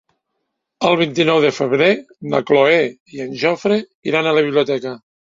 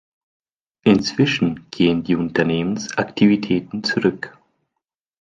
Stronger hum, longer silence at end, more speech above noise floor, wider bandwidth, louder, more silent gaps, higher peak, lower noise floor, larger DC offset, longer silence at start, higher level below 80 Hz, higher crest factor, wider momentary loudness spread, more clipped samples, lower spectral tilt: neither; second, 0.4 s vs 0.9 s; second, 58 dB vs 63 dB; second, 7.6 kHz vs 9 kHz; first, -16 LUFS vs -19 LUFS; first, 3.00-3.06 s, 3.95-4.02 s vs none; about the same, 0 dBFS vs -2 dBFS; second, -75 dBFS vs -81 dBFS; neither; about the same, 0.8 s vs 0.85 s; second, -62 dBFS vs -52 dBFS; about the same, 16 dB vs 18 dB; about the same, 9 LU vs 7 LU; neither; about the same, -5.5 dB/octave vs -6 dB/octave